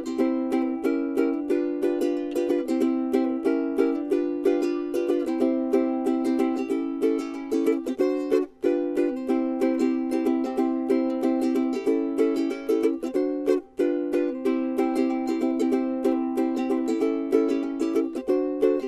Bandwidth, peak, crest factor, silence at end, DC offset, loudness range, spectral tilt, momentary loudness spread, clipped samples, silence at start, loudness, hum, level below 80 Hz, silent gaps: 13.5 kHz; -8 dBFS; 16 dB; 0 s; under 0.1%; 1 LU; -5.5 dB/octave; 2 LU; under 0.1%; 0 s; -25 LUFS; none; -64 dBFS; none